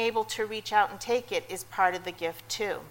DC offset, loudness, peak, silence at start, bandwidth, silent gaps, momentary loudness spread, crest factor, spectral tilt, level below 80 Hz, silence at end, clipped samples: under 0.1%; -30 LUFS; -10 dBFS; 0 s; 16.5 kHz; none; 8 LU; 20 dB; -2.5 dB/octave; -62 dBFS; 0 s; under 0.1%